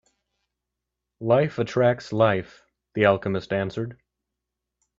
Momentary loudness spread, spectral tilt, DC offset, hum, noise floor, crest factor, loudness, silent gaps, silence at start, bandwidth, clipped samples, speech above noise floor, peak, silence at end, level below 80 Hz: 12 LU; -7.5 dB/octave; under 0.1%; none; -84 dBFS; 22 dB; -23 LUFS; none; 1.2 s; 7.6 kHz; under 0.1%; 62 dB; -4 dBFS; 1.05 s; -60 dBFS